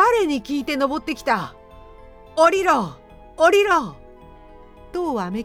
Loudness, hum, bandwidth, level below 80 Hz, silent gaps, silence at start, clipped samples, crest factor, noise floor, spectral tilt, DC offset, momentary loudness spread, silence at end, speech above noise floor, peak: -20 LUFS; none; 16 kHz; -48 dBFS; none; 0 s; under 0.1%; 16 dB; -44 dBFS; -4.5 dB/octave; under 0.1%; 15 LU; 0 s; 24 dB; -4 dBFS